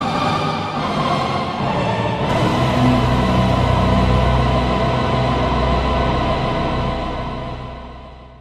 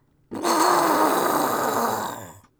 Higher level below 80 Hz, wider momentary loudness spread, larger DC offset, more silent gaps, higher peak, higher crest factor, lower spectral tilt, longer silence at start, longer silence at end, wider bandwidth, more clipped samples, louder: first, -26 dBFS vs -64 dBFS; second, 10 LU vs 13 LU; neither; neither; first, -2 dBFS vs -6 dBFS; about the same, 16 dB vs 16 dB; first, -7 dB/octave vs -3 dB/octave; second, 0 s vs 0.3 s; second, 0.05 s vs 0.25 s; second, 11.5 kHz vs over 20 kHz; neither; first, -18 LUFS vs -21 LUFS